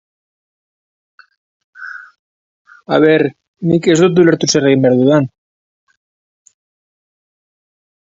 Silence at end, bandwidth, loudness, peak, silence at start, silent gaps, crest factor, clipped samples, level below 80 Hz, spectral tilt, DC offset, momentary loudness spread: 2.75 s; 7.8 kHz; -12 LUFS; 0 dBFS; 1.8 s; 2.19-2.65 s, 3.48-3.54 s; 16 dB; under 0.1%; -58 dBFS; -5.5 dB/octave; under 0.1%; 20 LU